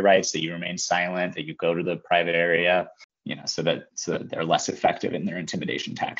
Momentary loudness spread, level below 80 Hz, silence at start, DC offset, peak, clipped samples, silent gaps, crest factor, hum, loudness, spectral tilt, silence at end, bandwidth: 9 LU; -68 dBFS; 0 s; under 0.1%; -4 dBFS; under 0.1%; 3.04-3.09 s; 20 dB; none; -25 LUFS; -2.5 dB/octave; 0.05 s; 8 kHz